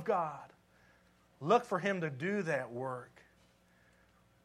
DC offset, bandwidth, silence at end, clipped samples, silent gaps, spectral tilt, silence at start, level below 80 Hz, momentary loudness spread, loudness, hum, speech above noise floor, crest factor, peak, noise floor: under 0.1%; 13.5 kHz; 1.4 s; under 0.1%; none; -6 dB/octave; 0 s; -76 dBFS; 15 LU; -35 LUFS; 60 Hz at -65 dBFS; 33 dB; 22 dB; -16 dBFS; -68 dBFS